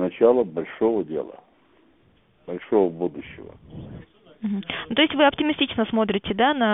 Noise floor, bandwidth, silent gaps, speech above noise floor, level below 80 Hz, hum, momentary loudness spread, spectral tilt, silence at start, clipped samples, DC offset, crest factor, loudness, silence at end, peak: -60 dBFS; 3.9 kHz; none; 37 dB; -56 dBFS; none; 21 LU; -9.5 dB/octave; 0 s; under 0.1%; under 0.1%; 18 dB; -22 LUFS; 0 s; -6 dBFS